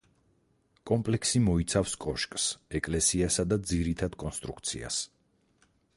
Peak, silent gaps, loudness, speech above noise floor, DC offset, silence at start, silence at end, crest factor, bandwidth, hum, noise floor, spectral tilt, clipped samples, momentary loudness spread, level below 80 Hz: -12 dBFS; none; -29 LUFS; 40 dB; under 0.1%; 0.85 s; 0.9 s; 18 dB; 11.5 kHz; none; -70 dBFS; -4 dB/octave; under 0.1%; 9 LU; -46 dBFS